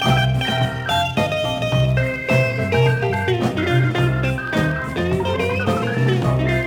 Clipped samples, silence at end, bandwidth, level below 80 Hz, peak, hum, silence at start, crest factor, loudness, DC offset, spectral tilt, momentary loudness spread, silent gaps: under 0.1%; 0 s; 16 kHz; -36 dBFS; -4 dBFS; none; 0 s; 14 dB; -19 LUFS; under 0.1%; -6.5 dB/octave; 3 LU; none